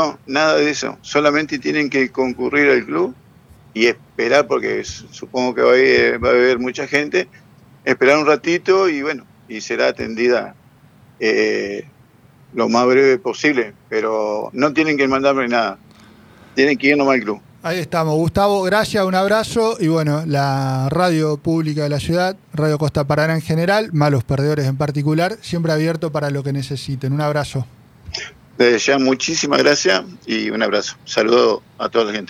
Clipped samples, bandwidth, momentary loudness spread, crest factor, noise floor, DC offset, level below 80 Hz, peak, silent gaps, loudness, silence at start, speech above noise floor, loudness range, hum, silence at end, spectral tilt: under 0.1%; 15.5 kHz; 10 LU; 16 dB; -49 dBFS; under 0.1%; -50 dBFS; -2 dBFS; none; -17 LUFS; 0 s; 32 dB; 4 LU; none; 0.05 s; -5 dB/octave